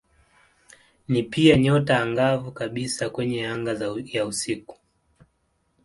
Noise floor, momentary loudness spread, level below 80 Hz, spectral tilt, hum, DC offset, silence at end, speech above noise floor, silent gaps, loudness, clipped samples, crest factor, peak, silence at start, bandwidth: -70 dBFS; 11 LU; -54 dBFS; -5.5 dB/octave; none; under 0.1%; 1.1 s; 47 dB; none; -23 LUFS; under 0.1%; 22 dB; -2 dBFS; 1.1 s; 11.5 kHz